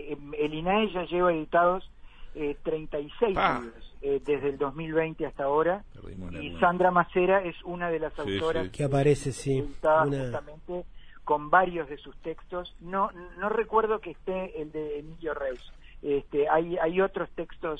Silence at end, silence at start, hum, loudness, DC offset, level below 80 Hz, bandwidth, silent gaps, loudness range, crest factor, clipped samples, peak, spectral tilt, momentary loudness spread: 0 s; 0 s; none; -28 LUFS; under 0.1%; -48 dBFS; 10.5 kHz; none; 4 LU; 20 dB; under 0.1%; -8 dBFS; -6.5 dB/octave; 14 LU